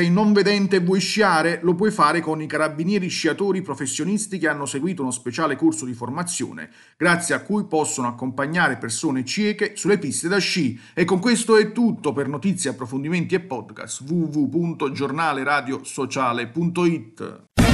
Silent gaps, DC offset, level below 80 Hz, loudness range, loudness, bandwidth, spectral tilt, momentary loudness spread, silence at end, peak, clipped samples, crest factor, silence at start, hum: none; under 0.1%; -44 dBFS; 4 LU; -22 LUFS; 12.5 kHz; -4.5 dB/octave; 9 LU; 0 s; -4 dBFS; under 0.1%; 18 dB; 0 s; none